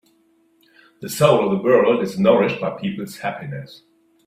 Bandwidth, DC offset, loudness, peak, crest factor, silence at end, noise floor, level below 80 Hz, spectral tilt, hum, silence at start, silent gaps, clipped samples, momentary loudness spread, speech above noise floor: 16 kHz; under 0.1%; -18 LUFS; -2 dBFS; 18 dB; 0.5 s; -60 dBFS; -58 dBFS; -6 dB/octave; none; 1 s; none; under 0.1%; 16 LU; 41 dB